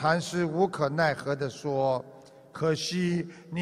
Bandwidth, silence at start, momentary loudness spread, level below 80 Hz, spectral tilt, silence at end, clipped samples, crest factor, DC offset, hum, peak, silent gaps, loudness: 13.5 kHz; 0 s; 7 LU; -64 dBFS; -5.5 dB/octave; 0 s; under 0.1%; 18 dB; under 0.1%; none; -10 dBFS; none; -29 LUFS